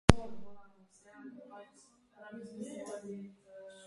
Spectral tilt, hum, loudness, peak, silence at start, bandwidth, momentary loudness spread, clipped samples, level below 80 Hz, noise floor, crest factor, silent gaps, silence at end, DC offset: -6 dB/octave; none; -40 LUFS; 0 dBFS; 0.1 s; 11.5 kHz; 17 LU; under 0.1%; -46 dBFS; -65 dBFS; 36 dB; none; 0 s; under 0.1%